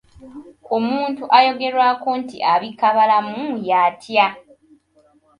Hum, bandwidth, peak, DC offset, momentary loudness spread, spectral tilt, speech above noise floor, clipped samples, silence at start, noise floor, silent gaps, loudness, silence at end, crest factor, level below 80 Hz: none; 10.5 kHz; 0 dBFS; under 0.1%; 9 LU; -5 dB/octave; 39 dB; under 0.1%; 0.2 s; -57 dBFS; none; -18 LUFS; 1 s; 18 dB; -64 dBFS